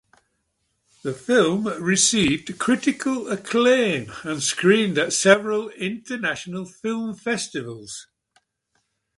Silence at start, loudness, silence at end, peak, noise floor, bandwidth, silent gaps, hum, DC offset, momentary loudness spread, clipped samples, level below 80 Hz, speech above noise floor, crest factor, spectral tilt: 1.05 s; -21 LUFS; 1.15 s; 0 dBFS; -73 dBFS; 11.5 kHz; none; none; under 0.1%; 15 LU; under 0.1%; -58 dBFS; 51 dB; 22 dB; -3.5 dB/octave